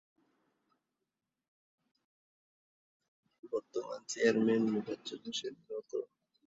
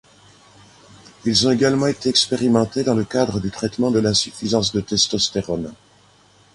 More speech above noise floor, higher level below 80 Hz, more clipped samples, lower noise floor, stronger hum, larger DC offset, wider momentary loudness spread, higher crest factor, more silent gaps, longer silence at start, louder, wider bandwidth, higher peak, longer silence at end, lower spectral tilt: first, 54 dB vs 34 dB; second, -82 dBFS vs -48 dBFS; neither; first, -89 dBFS vs -53 dBFS; second, none vs 50 Hz at -45 dBFS; neither; first, 13 LU vs 8 LU; first, 24 dB vs 18 dB; neither; first, 3.45 s vs 1.25 s; second, -35 LUFS vs -19 LUFS; second, 7.8 kHz vs 11.5 kHz; second, -16 dBFS vs -2 dBFS; second, 0.4 s vs 0.8 s; about the same, -4.5 dB/octave vs -4 dB/octave